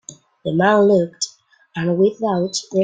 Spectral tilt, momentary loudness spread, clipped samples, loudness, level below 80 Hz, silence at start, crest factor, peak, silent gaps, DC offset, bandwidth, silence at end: -5 dB/octave; 12 LU; under 0.1%; -18 LUFS; -60 dBFS; 0.1 s; 16 dB; -2 dBFS; none; under 0.1%; 9.4 kHz; 0 s